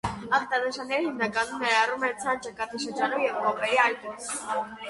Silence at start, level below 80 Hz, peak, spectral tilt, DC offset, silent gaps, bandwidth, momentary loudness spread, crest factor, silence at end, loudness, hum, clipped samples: 0.05 s; -58 dBFS; -8 dBFS; -3 dB/octave; under 0.1%; none; 11.5 kHz; 9 LU; 20 dB; 0 s; -27 LUFS; none; under 0.1%